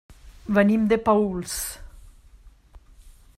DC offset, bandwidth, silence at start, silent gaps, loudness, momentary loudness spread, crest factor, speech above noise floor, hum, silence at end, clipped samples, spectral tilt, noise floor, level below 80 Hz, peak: under 0.1%; 15 kHz; 0.25 s; none; -22 LUFS; 17 LU; 20 dB; 29 dB; none; 0.25 s; under 0.1%; -5.5 dB/octave; -51 dBFS; -46 dBFS; -6 dBFS